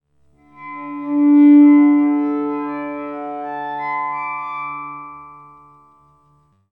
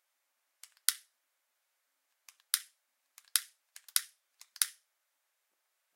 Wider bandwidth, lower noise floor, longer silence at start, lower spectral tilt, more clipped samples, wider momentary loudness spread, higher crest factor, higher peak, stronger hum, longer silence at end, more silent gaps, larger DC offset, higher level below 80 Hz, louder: second, 3.7 kHz vs 16.5 kHz; second, -57 dBFS vs -81 dBFS; second, 0.6 s vs 0.9 s; first, -9 dB/octave vs 9.5 dB/octave; neither; about the same, 21 LU vs 20 LU; second, 14 dB vs 40 dB; second, -4 dBFS vs 0 dBFS; neither; about the same, 1.35 s vs 1.25 s; neither; neither; first, -68 dBFS vs under -90 dBFS; first, -16 LUFS vs -33 LUFS